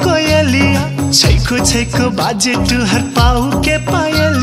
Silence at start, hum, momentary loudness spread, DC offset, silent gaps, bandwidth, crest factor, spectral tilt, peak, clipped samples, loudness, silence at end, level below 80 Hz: 0 s; none; 4 LU; under 0.1%; none; 16 kHz; 12 dB; -4.5 dB/octave; 0 dBFS; under 0.1%; -12 LUFS; 0 s; -22 dBFS